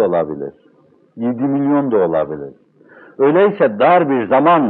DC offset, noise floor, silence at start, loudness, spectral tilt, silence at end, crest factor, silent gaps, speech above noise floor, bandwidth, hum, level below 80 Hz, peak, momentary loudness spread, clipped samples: under 0.1%; -47 dBFS; 0 s; -15 LUFS; -11 dB/octave; 0 s; 14 dB; none; 33 dB; 4.2 kHz; none; -62 dBFS; 0 dBFS; 14 LU; under 0.1%